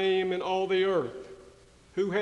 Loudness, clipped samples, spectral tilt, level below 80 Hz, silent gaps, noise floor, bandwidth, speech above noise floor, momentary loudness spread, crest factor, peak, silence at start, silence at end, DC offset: -29 LUFS; under 0.1%; -6 dB/octave; -64 dBFS; none; -55 dBFS; 9 kHz; 28 dB; 16 LU; 14 dB; -14 dBFS; 0 s; 0 s; under 0.1%